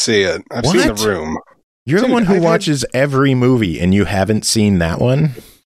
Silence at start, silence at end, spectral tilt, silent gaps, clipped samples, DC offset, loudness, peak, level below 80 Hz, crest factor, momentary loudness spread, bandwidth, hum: 0 s; 0.3 s; -5 dB/octave; 1.63-1.86 s; under 0.1%; under 0.1%; -14 LUFS; -2 dBFS; -38 dBFS; 14 dB; 6 LU; 15 kHz; none